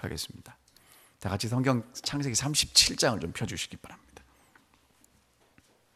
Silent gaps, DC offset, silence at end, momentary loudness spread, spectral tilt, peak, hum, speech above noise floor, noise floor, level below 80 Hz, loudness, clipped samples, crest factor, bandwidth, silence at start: none; under 0.1%; 2 s; 17 LU; -3 dB/octave; -6 dBFS; none; 36 dB; -66 dBFS; -54 dBFS; -27 LUFS; under 0.1%; 26 dB; 15.5 kHz; 0 s